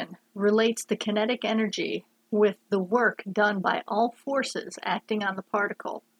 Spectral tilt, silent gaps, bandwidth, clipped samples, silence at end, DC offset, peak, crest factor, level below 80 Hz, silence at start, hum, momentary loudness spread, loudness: -4.5 dB/octave; none; 13.5 kHz; under 0.1%; 0.2 s; under 0.1%; -10 dBFS; 18 dB; -82 dBFS; 0 s; none; 7 LU; -27 LUFS